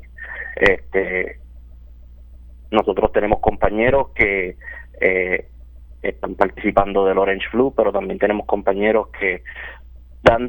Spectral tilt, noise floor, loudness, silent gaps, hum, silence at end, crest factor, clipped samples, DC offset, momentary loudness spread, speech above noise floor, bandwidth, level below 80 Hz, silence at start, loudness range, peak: -7 dB/octave; -40 dBFS; -19 LUFS; none; none; 0 s; 20 dB; under 0.1%; under 0.1%; 12 LU; 22 dB; 19 kHz; -36 dBFS; 0 s; 2 LU; 0 dBFS